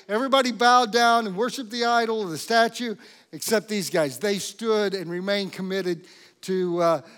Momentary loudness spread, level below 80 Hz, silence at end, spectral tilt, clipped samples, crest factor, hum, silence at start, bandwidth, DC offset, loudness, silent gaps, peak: 12 LU; -84 dBFS; 0.05 s; -3.5 dB/octave; under 0.1%; 18 dB; none; 0.1 s; 18 kHz; under 0.1%; -23 LUFS; none; -6 dBFS